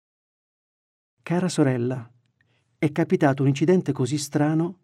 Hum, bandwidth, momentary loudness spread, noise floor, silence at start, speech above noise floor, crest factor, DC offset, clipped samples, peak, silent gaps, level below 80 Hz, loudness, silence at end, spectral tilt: none; 13.5 kHz; 7 LU; -67 dBFS; 1.25 s; 45 dB; 18 dB; under 0.1%; under 0.1%; -6 dBFS; none; -72 dBFS; -23 LUFS; 0.1 s; -6.5 dB/octave